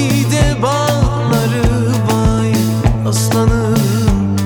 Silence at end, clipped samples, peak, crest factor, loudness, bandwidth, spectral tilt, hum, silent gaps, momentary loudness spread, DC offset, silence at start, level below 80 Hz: 0 s; under 0.1%; 0 dBFS; 12 dB; -14 LUFS; over 20 kHz; -6 dB/octave; none; none; 2 LU; under 0.1%; 0 s; -22 dBFS